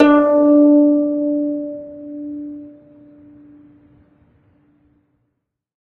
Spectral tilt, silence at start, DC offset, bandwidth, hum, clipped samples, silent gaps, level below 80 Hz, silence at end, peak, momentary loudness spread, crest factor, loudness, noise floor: -8 dB/octave; 0 s; under 0.1%; 4.2 kHz; none; under 0.1%; none; -58 dBFS; 3.2 s; 0 dBFS; 21 LU; 18 dB; -14 LUFS; -74 dBFS